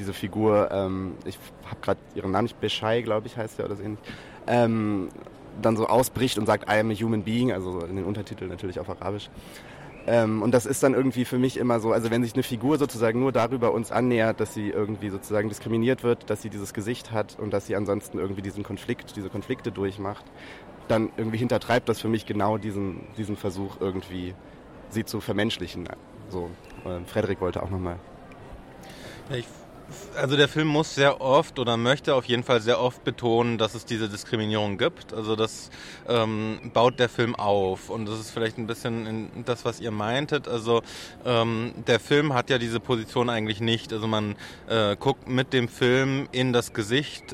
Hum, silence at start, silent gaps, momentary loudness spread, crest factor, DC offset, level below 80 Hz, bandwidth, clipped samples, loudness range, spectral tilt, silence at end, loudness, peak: none; 0 s; none; 15 LU; 20 dB; under 0.1%; -54 dBFS; 16.5 kHz; under 0.1%; 7 LU; -5.5 dB/octave; 0 s; -26 LUFS; -6 dBFS